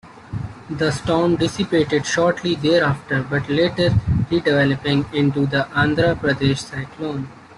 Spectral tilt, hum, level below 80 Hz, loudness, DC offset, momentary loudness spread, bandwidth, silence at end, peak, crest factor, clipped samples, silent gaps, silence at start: -6 dB/octave; none; -42 dBFS; -19 LUFS; under 0.1%; 10 LU; 11.5 kHz; 0.05 s; -4 dBFS; 16 dB; under 0.1%; none; 0.05 s